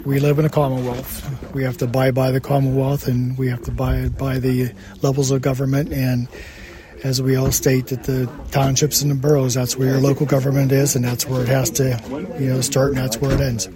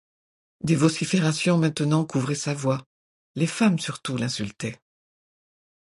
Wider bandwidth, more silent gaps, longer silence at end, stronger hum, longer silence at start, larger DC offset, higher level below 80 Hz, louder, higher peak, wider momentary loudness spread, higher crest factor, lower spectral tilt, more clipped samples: first, 16.5 kHz vs 11.5 kHz; second, none vs 2.86-3.34 s; second, 0 s vs 1.15 s; neither; second, 0 s vs 0.65 s; neither; first, -36 dBFS vs -62 dBFS; first, -19 LUFS vs -24 LUFS; first, -2 dBFS vs -6 dBFS; about the same, 8 LU vs 10 LU; about the same, 16 dB vs 20 dB; about the same, -5.5 dB/octave vs -5.5 dB/octave; neither